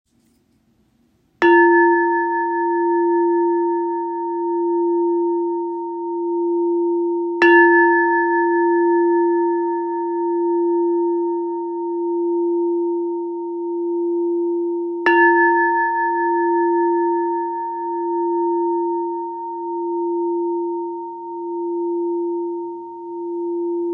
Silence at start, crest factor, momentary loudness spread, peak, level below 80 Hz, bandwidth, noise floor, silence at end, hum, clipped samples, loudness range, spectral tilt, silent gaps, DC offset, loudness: 1.4 s; 18 dB; 12 LU; -2 dBFS; -74 dBFS; 5.6 kHz; -60 dBFS; 0 s; none; under 0.1%; 8 LU; -6 dB/octave; none; under 0.1%; -19 LUFS